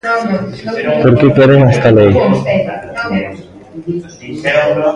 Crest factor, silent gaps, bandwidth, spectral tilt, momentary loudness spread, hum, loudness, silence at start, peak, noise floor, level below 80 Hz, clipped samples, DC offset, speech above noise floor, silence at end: 12 dB; none; 10 kHz; -8 dB/octave; 15 LU; none; -11 LUFS; 0.05 s; 0 dBFS; -31 dBFS; -38 dBFS; under 0.1%; under 0.1%; 21 dB; 0 s